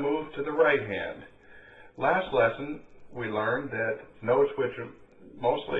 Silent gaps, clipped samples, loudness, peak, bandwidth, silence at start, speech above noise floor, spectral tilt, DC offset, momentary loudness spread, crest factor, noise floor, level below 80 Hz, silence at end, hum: none; under 0.1%; -28 LUFS; -10 dBFS; 4.2 kHz; 0 s; 23 dB; -8 dB/octave; under 0.1%; 16 LU; 18 dB; -51 dBFS; -58 dBFS; 0 s; none